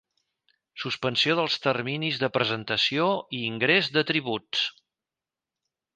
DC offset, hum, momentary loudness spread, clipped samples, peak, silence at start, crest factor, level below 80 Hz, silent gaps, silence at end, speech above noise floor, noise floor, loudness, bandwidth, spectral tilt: under 0.1%; none; 7 LU; under 0.1%; -8 dBFS; 0.75 s; 20 dB; -70 dBFS; none; 1.25 s; over 64 dB; under -90 dBFS; -25 LUFS; 9.6 kHz; -4.5 dB/octave